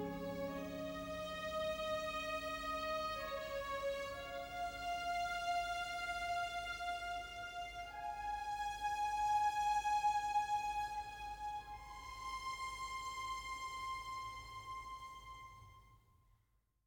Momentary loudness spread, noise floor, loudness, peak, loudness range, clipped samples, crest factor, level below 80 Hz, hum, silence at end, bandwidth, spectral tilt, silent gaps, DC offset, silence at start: 13 LU; -79 dBFS; -42 LUFS; -28 dBFS; 7 LU; under 0.1%; 14 dB; -62 dBFS; none; 0.85 s; over 20 kHz; -3 dB/octave; none; under 0.1%; 0 s